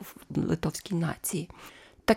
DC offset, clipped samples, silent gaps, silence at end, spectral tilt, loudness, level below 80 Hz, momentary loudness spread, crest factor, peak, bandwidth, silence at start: under 0.1%; under 0.1%; none; 0 s; -5.5 dB/octave; -32 LUFS; -52 dBFS; 15 LU; 24 dB; -6 dBFS; 17 kHz; 0 s